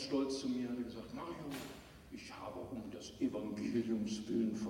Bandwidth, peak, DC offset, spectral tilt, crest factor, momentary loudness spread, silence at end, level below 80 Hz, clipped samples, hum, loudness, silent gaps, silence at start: 16.5 kHz; -24 dBFS; under 0.1%; -5.5 dB/octave; 16 dB; 13 LU; 0 s; -66 dBFS; under 0.1%; none; -41 LUFS; none; 0 s